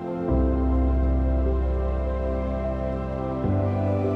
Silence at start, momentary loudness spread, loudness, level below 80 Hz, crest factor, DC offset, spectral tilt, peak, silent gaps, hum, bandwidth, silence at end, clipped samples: 0 s; 5 LU; -25 LUFS; -26 dBFS; 12 dB; under 0.1%; -10.5 dB/octave; -12 dBFS; none; none; 4.4 kHz; 0 s; under 0.1%